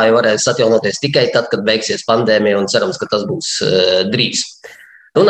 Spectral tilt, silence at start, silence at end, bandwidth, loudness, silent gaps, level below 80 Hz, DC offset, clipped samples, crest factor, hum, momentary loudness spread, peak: -3.5 dB/octave; 0 s; 0 s; 9.8 kHz; -14 LUFS; none; -58 dBFS; under 0.1%; under 0.1%; 14 dB; none; 6 LU; 0 dBFS